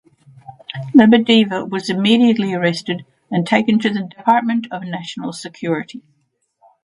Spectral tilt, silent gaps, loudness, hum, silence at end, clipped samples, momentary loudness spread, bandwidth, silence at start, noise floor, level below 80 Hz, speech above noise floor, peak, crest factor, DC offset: -6 dB/octave; none; -16 LUFS; none; 0.85 s; under 0.1%; 16 LU; 11 kHz; 0.5 s; -60 dBFS; -60 dBFS; 44 dB; 0 dBFS; 16 dB; under 0.1%